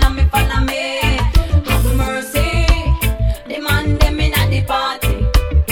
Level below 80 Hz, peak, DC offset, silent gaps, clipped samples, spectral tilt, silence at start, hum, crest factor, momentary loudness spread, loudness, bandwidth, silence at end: -16 dBFS; 0 dBFS; under 0.1%; none; under 0.1%; -5 dB/octave; 0 s; none; 14 dB; 4 LU; -16 LUFS; 18.5 kHz; 0 s